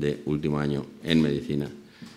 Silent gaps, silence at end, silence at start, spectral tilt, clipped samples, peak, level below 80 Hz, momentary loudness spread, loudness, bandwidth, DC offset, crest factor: none; 0 s; 0 s; -7 dB/octave; under 0.1%; -6 dBFS; -52 dBFS; 10 LU; -27 LUFS; 13 kHz; under 0.1%; 20 dB